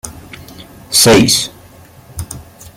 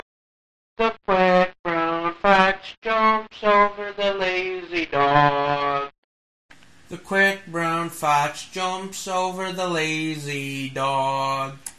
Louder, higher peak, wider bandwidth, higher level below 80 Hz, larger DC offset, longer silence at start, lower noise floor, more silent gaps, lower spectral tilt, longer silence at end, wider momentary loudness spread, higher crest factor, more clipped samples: first, -9 LUFS vs -22 LUFS; about the same, 0 dBFS vs 0 dBFS; first, 17 kHz vs 13.5 kHz; first, -40 dBFS vs -56 dBFS; second, under 0.1% vs 0.2%; second, 0.05 s vs 0.8 s; second, -40 dBFS vs under -90 dBFS; second, none vs 1.59-1.64 s, 2.78-2.82 s, 5.98-6.49 s; second, -3 dB/octave vs -4.5 dB/octave; first, 0.35 s vs 0.05 s; first, 26 LU vs 10 LU; second, 16 dB vs 22 dB; neither